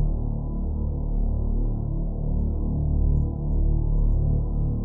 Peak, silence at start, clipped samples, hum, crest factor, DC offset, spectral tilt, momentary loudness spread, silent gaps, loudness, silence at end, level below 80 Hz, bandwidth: -12 dBFS; 0 s; under 0.1%; none; 12 dB; under 0.1%; -15.5 dB/octave; 5 LU; none; -27 LUFS; 0 s; -24 dBFS; 1.2 kHz